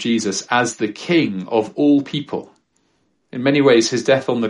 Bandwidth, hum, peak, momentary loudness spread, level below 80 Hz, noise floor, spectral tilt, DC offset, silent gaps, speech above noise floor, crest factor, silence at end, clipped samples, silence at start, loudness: 11 kHz; none; -2 dBFS; 11 LU; -64 dBFS; -65 dBFS; -4.5 dB/octave; under 0.1%; none; 47 dB; 16 dB; 0 s; under 0.1%; 0 s; -17 LUFS